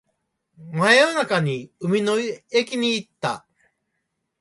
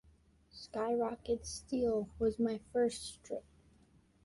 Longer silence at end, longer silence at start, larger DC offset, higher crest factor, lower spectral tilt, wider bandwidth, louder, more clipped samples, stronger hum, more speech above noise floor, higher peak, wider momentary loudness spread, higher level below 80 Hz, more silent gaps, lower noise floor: first, 1 s vs 0.85 s; about the same, 0.6 s vs 0.55 s; neither; about the same, 20 dB vs 16 dB; about the same, -4.5 dB/octave vs -5 dB/octave; about the same, 11.5 kHz vs 11.5 kHz; first, -21 LUFS vs -37 LUFS; neither; neither; first, 55 dB vs 31 dB; first, -4 dBFS vs -22 dBFS; about the same, 13 LU vs 12 LU; second, -68 dBFS vs -60 dBFS; neither; first, -77 dBFS vs -67 dBFS